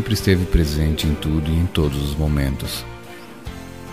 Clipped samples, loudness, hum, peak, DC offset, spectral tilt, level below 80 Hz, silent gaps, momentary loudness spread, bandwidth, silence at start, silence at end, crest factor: under 0.1%; -20 LUFS; none; -2 dBFS; 0.6%; -6 dB/octave; -26 dBFS; none; 17 LU; 15.5 kHz; 0 s; 0 s; 18 dB